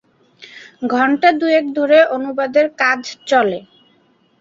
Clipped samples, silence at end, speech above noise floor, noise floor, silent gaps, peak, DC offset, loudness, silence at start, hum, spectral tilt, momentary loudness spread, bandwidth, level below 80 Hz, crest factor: under 0.1%; 0.8 s; 41 dB; -56 dBFS; none; -2 dBFS; under 0.1%; -15 LUFS; 0.4 s; none; -4 dB/octave; 8 LU; 7.8 kHz; -66 dBFS; 16 dB